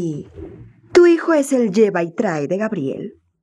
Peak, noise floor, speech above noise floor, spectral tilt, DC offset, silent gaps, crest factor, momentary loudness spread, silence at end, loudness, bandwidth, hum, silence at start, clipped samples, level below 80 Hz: 0 dBFS; -40 dBFS; 21 dB; -6 dB/octave; under 0.1%; none; 16 dB; 22 LU; 0.3 s; -17 LUFS; 12.5 kHz; none; 0 s; under 0.1%; -54 dBFS